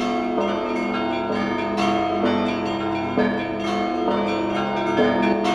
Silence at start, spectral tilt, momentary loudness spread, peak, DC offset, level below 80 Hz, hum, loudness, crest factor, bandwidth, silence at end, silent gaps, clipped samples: 0 s; -6 dB/octave; 4 LU; -6 dBFS; under 0.1%; -52 dBFS; none; -22 LUFS; 16 dB; 10.5 kHz; 0 s; none; under 0.1%